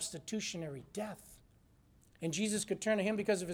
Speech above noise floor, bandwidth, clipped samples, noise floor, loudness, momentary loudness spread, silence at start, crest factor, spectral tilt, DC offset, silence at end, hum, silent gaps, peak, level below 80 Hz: 30 dB; 18 kHz; under 0.1%; -66 dBFS; -37 LUFS; 11 LU; 0 s; 20 dB; -4 dB/octave; under 0.1%; 0 s; none; none; -18 dBFS; -68 dBFS